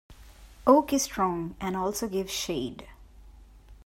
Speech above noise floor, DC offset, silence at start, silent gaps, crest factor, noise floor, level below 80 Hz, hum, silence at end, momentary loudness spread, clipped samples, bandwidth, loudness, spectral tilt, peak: 24 dB; under 0.1%; 0.1 s; none; 24 dB; -51 dBFS; -52 dBFS; none; 0.1 s; 11 LU; under 0.1%; 16 kHz; -27 LUFS; -4 dB/octave; -6 dBFS